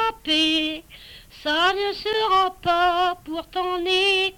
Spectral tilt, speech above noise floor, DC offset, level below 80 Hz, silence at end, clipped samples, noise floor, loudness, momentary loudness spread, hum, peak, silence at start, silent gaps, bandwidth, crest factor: -2.5 dB/octave; 23 dB; under 0.1%; -50 dBFS; 0.05 s; under 0.1%; -45 dBFS; -21 LUFS; 10 LU; none; -10 dBFS; 0 s; none; 18.5 kHz; 12 dB